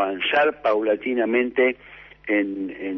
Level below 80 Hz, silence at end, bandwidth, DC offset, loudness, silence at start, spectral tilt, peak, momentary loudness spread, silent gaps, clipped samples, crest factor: -60 dBFS; 0 s; 6 kHz; under 0.1%; -22 LUFS; 0 s; -6.5 dB/octave; -8 dBFS; 9 LU; none; under 0.1%; 14 dB